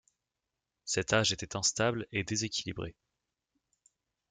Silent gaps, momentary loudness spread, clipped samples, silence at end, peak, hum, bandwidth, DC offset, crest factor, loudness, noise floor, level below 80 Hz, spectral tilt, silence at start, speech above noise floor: none; 13 LU; under 0.1%; 1.4 s; -12 dBFS; none; 10.5 kHz; under 0.1%; 24 dB; -31 LUFS; -88 dBFS; -62 dBFS; -3 dB/octave; 0.85 s; 55 dB